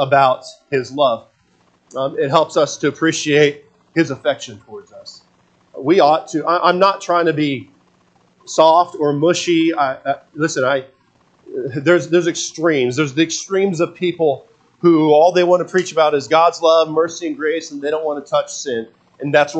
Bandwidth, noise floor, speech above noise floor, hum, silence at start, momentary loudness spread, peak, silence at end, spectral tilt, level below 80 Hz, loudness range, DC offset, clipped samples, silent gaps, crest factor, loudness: 8.8 kHz; -57 dBFS; 42 dB; none; 0 s; 12 LU; 0 dBFS; 0 s; -4.5 dB/octave; -68 dBFS; 4 LU; under 0.1%; under 0.1%; none; 16 dB; -16 LUFS